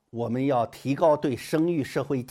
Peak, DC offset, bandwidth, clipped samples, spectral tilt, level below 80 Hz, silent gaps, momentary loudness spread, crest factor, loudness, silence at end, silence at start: -10 dBFS; under 0.1%; 16 kHz; under 0.1%; -7 dB/octave; -64 dBFS; none; 6 LU; 16 dB; -26 LUFS; 0.05 s; 0.15 s